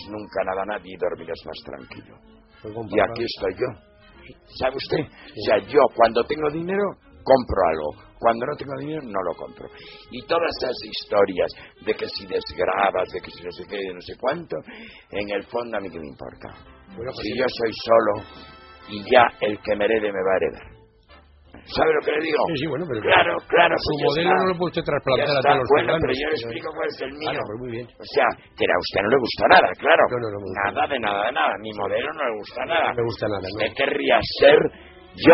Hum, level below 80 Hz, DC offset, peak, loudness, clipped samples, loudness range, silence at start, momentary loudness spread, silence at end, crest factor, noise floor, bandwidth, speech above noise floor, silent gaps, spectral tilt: none; -50 dBFS; under 0.1%; 0 dBFS; -22 LUFS; under 0.1%; 8 LU; 0 s; 18 LU; 0 s; 22 dB; -51 dBFS; 6 kHz; 29 dB; none; -2.5 dB/octave